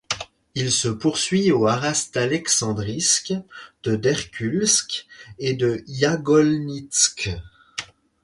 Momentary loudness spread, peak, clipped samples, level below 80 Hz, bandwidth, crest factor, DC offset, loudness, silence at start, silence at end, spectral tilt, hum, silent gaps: 13 LU; -4 dBFS; under 0.1%; -50 dBFS; 11.5 kHz; 18 dB; under 0.1%; -21 LUFS; 0.1 s; 0.4 s; -3.5 dB/octave; none; none